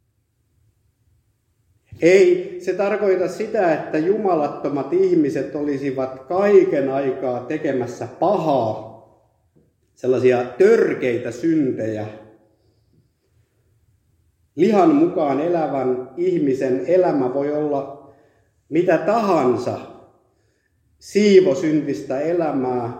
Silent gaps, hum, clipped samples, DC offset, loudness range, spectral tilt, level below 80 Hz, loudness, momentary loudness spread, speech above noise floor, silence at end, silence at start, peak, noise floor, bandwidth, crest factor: none; none; under 0.1%; under 0.1%; 4 LU; -7 dB/octave; -64 dBFS; -19 LUFS; 11 LU; 48 dB; 0 s; 1.9 s; 0 dBFS; -67 dBFS; 9 kHz; 20 dB